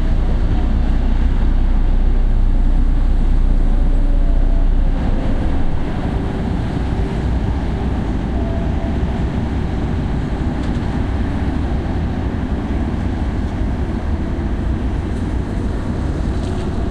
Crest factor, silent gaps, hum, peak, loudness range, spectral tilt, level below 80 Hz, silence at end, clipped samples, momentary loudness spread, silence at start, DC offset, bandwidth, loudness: 12 dB; none; none; -4 dBFS; 2 LU; -8.5 dB/octave; -16 dBFS; 0 s; under 0.1%; 2 LU; 0 s; under 0.1%; 5 kHz; -20 LUFS